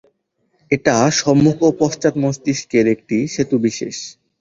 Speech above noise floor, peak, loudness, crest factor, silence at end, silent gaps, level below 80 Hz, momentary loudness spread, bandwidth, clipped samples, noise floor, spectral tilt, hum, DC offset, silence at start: 50 dB; -2 dBFS; -17 LUFS; 16 dB; 0.3 s; none; -52 dBFS; 9 LU; 7.8 kHz; under 0.1%; -66 dBFS; -5 dB/octave; none; under 0.1%; 0.7 s